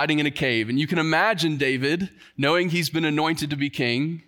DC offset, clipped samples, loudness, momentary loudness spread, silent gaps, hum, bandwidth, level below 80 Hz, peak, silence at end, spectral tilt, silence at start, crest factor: under 0.1%; under 0.1%; -23 LUFS; 5 LU; none; none; 18 kHz; -60 dBFS; -8 dBFS; 0.05 s; -5 dB/octave; 0 s; 16 dB